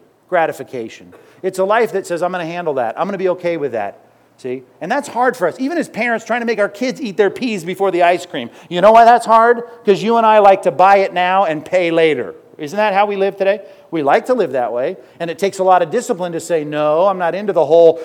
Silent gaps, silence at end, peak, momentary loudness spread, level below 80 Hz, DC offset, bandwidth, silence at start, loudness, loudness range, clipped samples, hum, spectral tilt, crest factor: none; 0 s; 0 dBFS; 15 LU; -62 dBFS; under 0.1%; 16 kHz; 0.3 s; -15 LUFS; 8 LU; 0.1%; none; -5 dB/octave; 14 dB